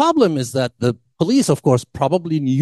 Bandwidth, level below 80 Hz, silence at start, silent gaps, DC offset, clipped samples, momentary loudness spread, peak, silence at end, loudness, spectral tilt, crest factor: 12.5 kHz; -54 dBFS; 0 s; none; under 0.1%; under 0.1%; 6 LU; -2 dBFS; 0 s; -18 LUFS; -6 dB/octave; 16 dB